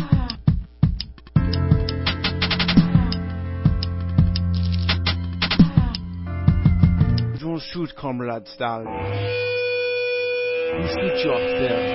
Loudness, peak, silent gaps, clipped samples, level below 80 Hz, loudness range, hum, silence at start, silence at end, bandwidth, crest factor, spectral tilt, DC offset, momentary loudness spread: -22 LUFS; -2 dBFS; none; under 0.1%; -28 dBFS; 4 LU; none; 0 s; 0 s; 5.8 kHz; 20 dB; -10.5 dB/octave; under 0.1%; 10 LU